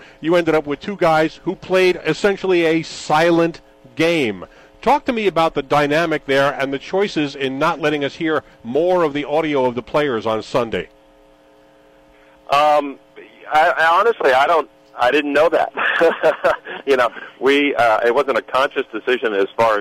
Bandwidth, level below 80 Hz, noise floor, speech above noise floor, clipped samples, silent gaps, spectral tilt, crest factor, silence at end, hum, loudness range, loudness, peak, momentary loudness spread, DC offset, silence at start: 15.5 kHz; -52 dBFS; -50 dBFS; 33 dB; under 0.1%; none; -5 dB/octave; 12 dB; 0 s; none; 5 LU; -17 LUFS; -6 dBFS; 7 LU; under 0.1%; 0.2 s